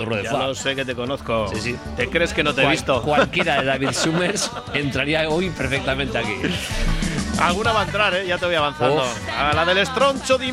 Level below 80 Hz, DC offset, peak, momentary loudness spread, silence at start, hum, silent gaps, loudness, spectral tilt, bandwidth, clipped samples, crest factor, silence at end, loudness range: -34 dBFS; under 0.1%; -2 dBFS; 6 LU; 0 s; none; none; -20 LUFS; -4 dB/octave; 15.5 kHz; under 0.1%; 18 dB; 0 s; 2 LU